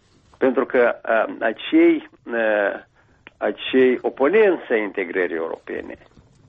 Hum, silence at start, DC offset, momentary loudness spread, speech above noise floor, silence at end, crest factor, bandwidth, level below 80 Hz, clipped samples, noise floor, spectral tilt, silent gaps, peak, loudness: none; 0.4 s; under 0.1%; 12 LU; 31 dB; 0.55 s; 14 dB; 4.4 kHz; -62 dBFS; under 0.1%; -51 dBFS; -7 dB/octave; none; -6 dBFS; -20 LUFS